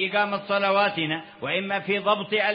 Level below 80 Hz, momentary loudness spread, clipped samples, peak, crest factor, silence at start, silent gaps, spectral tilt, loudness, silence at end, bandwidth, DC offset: -72 dBFS; 6 LU; under 0.1%; -8 dBFS; 16 dB; 0 s; none; -9 dB/octave; -24 LUFS; 0 s; 5.4 kHz; under 0.1%